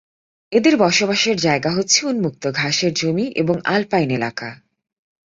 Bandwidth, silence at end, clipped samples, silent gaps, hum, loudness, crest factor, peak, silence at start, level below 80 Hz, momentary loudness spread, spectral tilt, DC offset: 7.8 kHz; 0.75 s; under 0.1%; none; none; -18 LUFS; 18 dB; 0 dBFS; 0.5 s; -58 dBFS; 7 LU; -3.5 dB/octave; under 0.1%